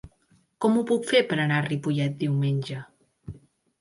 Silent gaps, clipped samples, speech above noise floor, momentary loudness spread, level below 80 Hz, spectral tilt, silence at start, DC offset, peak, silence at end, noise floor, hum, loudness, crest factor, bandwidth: none; under 0.1%; 40 dB; 18 LU; -60 dBFS; -6.5 dB/octave; 0.05 s; under 0.1%; -8 dBFS; 0.45 s; -64 dBFS; none; -25 LUFS; 18 dB; 11.5 kHz